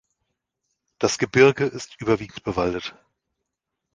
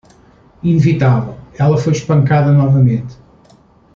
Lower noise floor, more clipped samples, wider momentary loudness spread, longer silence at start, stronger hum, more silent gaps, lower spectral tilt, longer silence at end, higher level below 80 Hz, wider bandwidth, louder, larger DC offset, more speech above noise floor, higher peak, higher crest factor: first, -82 dBFS vs -47 dBFS; neither; first, 13 LU vs 10 LU; first, 1 s vs 0.65 s; neither; neither; second, -5 dB/octave vs -8.5 dB/octave; first, 1.05 s vs 0.8 s; second, -52 dBFS vs -44 dBFS; first, 9.8 kHz vs 7.2 kHz; second, -22 LUFS vs -13 LUFS; neither; first, 61 dB vs 36 dB; about the same, -4 dBFS vs -2 dBFS; first, 22 dB vs 12 dB